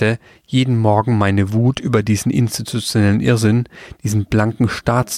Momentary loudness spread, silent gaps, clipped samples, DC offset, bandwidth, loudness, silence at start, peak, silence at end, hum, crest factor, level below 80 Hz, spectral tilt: 6 LU; none; under 0.1%; under 0.1%; 15 kHz; -17 LUFS; 0 s; -2 dBFS; 0 s; none; 14 dB; -42 dBFS; -6 dB/octave